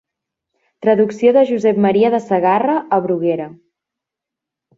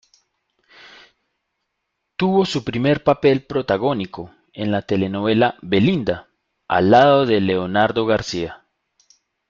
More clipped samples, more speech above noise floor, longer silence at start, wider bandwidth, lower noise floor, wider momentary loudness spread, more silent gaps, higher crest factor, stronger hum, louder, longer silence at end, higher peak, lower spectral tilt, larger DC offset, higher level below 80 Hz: neither; first, 70 dB vs 59 dB; second, 0.8 s vs 2.2 s; about the same, 7.8 kHz vs 7.6 kHz; first, -84 dBFS vs -76 dBFS; second, 7 LU vs 13 LU; neither; about the same, 16 dB vs 18 dB; neither; first, -15 LUFS vs -18 LUFS; first, 1.25 s vs 0.95 s; about the same, -2 dBFS vs 0 dBFS; about the same, -7.5 dB/octave vs -6.5 dB/octave; neither; second, -64 dBFS vs -52 dBFS